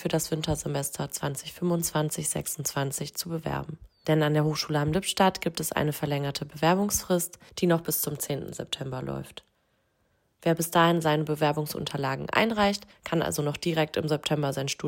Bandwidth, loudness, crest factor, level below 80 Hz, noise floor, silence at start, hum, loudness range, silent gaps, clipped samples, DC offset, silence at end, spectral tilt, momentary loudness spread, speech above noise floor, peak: 16.5 kHz; -28 LUFS; 20 dB; -54 dBFS; -71 dBFS; 0 s; none; 4 LU; none; under 0.1%; under 0.1%; 0 s; -4.5 dB/octave; 10 LU; 44 dB; -8 dBFS